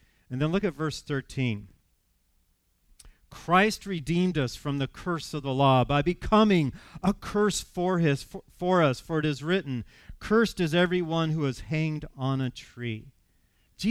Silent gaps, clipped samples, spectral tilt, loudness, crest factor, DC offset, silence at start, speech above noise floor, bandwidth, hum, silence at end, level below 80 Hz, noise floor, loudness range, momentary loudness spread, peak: none; under 0.1%; -6 dB/octave; -27 LUFS; 20 dB; under 0.1%; 0.3 s; 43 dB; 15 kHz; none; 0 s; -50 dBFS; -69 dBFS; 5 LU; 13 LU; -8 dBFS